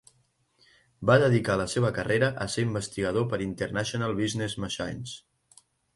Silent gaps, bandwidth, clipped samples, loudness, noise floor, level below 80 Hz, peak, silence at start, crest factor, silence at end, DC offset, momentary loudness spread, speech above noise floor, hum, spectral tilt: none; 11.5 kHz; under 0.1%; -27 LUFS; -69 dBFS; -54 dBFS; -8 dBFS; 1 s; 20 dB; 0.75 s; under 0.1%; 11 LU; 42 dB; none; -5.5 dB/octave